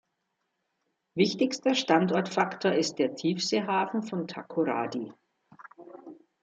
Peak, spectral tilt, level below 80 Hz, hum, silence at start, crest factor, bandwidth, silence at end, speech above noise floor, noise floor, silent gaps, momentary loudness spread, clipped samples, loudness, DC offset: -8 dBFS; -4.5 dB/octave; -76 dBFS; none; 1.15 s; 22 dB; 9 kHz; 0.3 s; 52 dB; -80 dBFS; none; 16 LU; under 0.1%; -28 LUFS; under 0.1%